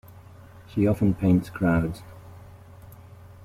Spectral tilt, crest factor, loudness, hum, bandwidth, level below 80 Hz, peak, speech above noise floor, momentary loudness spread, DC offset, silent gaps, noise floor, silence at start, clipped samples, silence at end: -9 dB/octave; 16 dB; -24 LUFS; none; 15.5 kHz; -48 dBFS; -10 dBFS; 24 dB; 24 LU; under 0.1%; none; -47 dBFS; 0.55 s; under 0.1%; 0 s